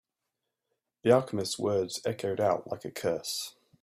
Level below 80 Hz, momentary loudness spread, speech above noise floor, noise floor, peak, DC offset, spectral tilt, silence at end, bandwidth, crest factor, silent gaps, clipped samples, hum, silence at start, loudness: -70 dBFS; 10 LU; 56 dB; -86 dBFS; -10 dBFS; under 0.1%; -4.5 dB/octave; 0.35 s; 15.5 kHz; 22 dB; none; under 0.1%; none; 1.05 s; -30 LUFS